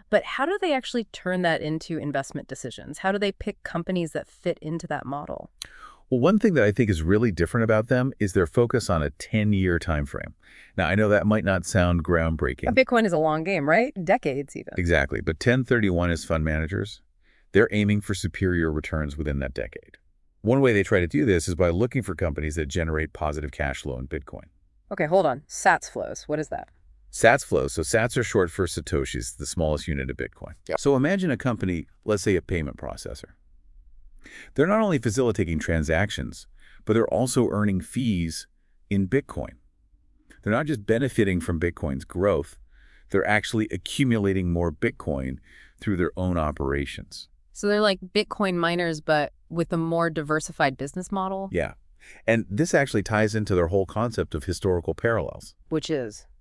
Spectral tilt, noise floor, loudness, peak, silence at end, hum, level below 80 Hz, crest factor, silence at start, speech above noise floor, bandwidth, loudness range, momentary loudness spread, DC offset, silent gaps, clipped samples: -6 dB/octave; -60 dBFS; -25 LUFS; -2 dBFS; 0.2 s; none; -42 dBFS; 24 dB; 0.1 s; 35 dB; 12 kHz; 5 LU; 13 LU; under 0.1%; none; under 0.1%